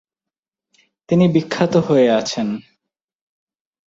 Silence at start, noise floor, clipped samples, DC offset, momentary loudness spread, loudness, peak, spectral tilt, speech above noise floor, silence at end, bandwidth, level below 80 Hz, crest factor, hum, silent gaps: 1.1 s; -88 dBFS; under 0.1%; under 0.1%; 9 LU; -17 LUFS; -2 dBFS; -6.5 dB/octave; 72 dB; 1.25 s; 7.8 kHz; -58 dBFS; 16 dB; none; none